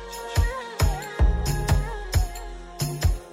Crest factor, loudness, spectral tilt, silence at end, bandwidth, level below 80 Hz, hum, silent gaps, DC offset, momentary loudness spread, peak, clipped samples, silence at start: 14 dB; -26 LUFS; -5 dB/octave; 0 s; 16 kHz; -26 dBFS; none; none; under 0.1%; 7 LU; -12 dBFS; under 0.1%; 0 s